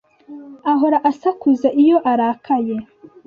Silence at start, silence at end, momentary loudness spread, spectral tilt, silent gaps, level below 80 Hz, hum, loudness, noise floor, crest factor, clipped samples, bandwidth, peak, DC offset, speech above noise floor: 0.3 s; 0.45 s; 11 LU; -7.5 dB/octave; none; -62 dBFS; none; -17 LUFS; -38 dBFS; 14 dB; under 0.1%; 6.8 kHz; -4 dBFS; under 0.1%; 22 dB